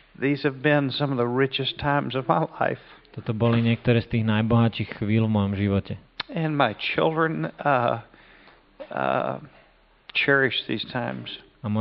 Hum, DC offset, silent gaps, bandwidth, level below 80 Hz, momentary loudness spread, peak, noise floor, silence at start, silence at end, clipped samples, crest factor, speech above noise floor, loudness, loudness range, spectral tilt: none; under 0.1%; none; 5.6 kHz; -54 dBFS; 11 LU; -4 dBFS; -58 dBFS; 0.2 s; 0 s; under 0.1%; 20 dB; 34 dB; -24 LUFS; 3 LU; -4.5 dB/octave